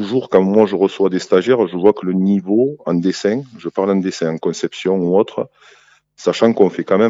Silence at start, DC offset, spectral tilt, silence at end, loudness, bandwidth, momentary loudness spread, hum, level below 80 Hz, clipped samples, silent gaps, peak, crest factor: 0 s; under 0.1%; -6.5 dB/octave; 0 s; -16 LUFS; 8 kHz; 8 LU; none; -64 dBFS; under 0.1%; none; 0 dBFS; 16 dB